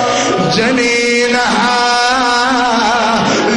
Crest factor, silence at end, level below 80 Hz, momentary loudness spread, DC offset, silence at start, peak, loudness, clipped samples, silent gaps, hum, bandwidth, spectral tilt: 10 dB; 0 s; -44 dBFS; 1 LU; under 0.1%; 0 s; -2 dBFS; -11 LUFS; under 0.1%; none; none; 10.5 kHz; -3 dB/octave